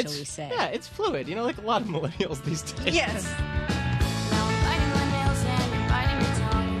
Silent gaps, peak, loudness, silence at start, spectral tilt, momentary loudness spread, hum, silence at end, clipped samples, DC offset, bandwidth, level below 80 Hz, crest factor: none; -8 dBFS; -27 LUFS; 0 s; -5 dB/octave; 6 LU; none; 0 s; under 0.1%; under 0.1%; 13.5 kHz; -34 dBFS; 20 dB